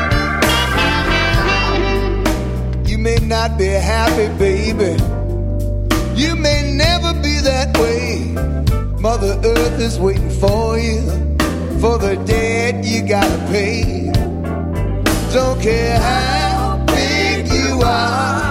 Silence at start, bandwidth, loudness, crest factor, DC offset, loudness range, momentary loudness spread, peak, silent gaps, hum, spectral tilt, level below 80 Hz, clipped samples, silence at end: 0 s; 16.5 kHz; -16 LUFS; 14 dB; under 0.1%; 1 LU; 5 LU; -2 dBFS; none; none; -5 dB/octave; -22 dBFS; under 0.1%; 0 s